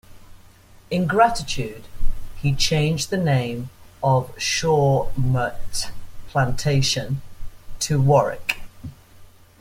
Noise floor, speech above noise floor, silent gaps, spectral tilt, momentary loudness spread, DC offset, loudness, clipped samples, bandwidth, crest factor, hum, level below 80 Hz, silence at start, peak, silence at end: -48 dBFS; 28 dB; none; -5 dB/octave; 16 LU; under 0.1%; -22 LUFS; under 0.1%; 16 kHz; 18 dB; none; -34 dBFS; 0.1 s; -2 dBFS; 0.35 s